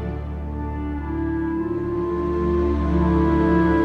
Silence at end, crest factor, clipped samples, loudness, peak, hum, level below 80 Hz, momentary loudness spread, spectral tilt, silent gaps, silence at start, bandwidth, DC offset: 0 s; 14 dB; under 0.1%; -22 LUFS; -8 dBFS; none; -30 dBFS; 11 LU; -10 dB/octave; none; 0 s; 6 kHz; under 0.1%